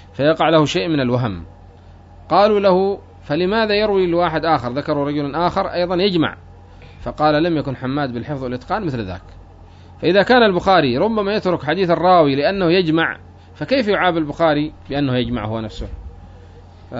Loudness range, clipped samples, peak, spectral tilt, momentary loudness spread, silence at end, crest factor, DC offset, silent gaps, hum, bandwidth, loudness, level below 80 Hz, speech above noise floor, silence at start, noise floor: 5 LU; under 0.1%; -2 dBFS; -6.5 dB/octave; 12 LU; 0 s; 16 dB; under 0.1%; none; none; 7.8 kHz; -17 LUFS; -42 dBFS; 25 dB; 0.15 s; -42 dBFS